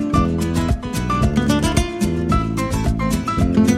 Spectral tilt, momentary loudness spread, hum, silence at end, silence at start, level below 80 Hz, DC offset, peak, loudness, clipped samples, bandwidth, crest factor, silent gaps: -6 dB/octave; 4 LU; none; 0 s; 0 s; -26 dBFS; under 0.1%; -2 dBFS; -19 LUFS; under 0.1%; 15.5 kHz; 16 dB; none